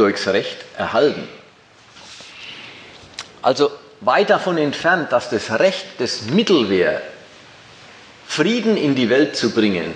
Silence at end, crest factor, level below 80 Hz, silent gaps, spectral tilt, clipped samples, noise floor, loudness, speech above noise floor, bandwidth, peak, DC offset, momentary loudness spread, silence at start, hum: 0 s; 18 dB; -62 dBFS; none; -4.5 dB/octave; under 0.1%; -48 dBFS; -18 LUFS; 30 dB; 10 kHz; -2 dBFS; under 0.1%; 19 LU; 0 s; none